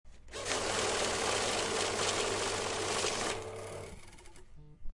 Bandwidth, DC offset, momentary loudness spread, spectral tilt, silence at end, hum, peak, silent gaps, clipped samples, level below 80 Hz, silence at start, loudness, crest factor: 11.5 kHz; under 0.1%; 14 LU; -1.5 dB/octave; 0 s; none; -16 dBFS; none; under 0.1%; -54 dBFS; 0.05 s; -33 LUFS; 20 dB